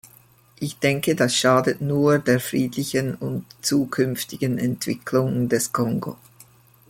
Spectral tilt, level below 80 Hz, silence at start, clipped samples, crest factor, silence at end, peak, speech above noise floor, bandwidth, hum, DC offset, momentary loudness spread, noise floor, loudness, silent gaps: -5 dB/octave; -58 dBFS; 0.05 s; under 0.1%; 18 dB; 0.75 s; -4 dBFS; 32 dB; 17 kHz; none; under 0.1%; 10 LU; -53 dBFS; -22 LUFS; none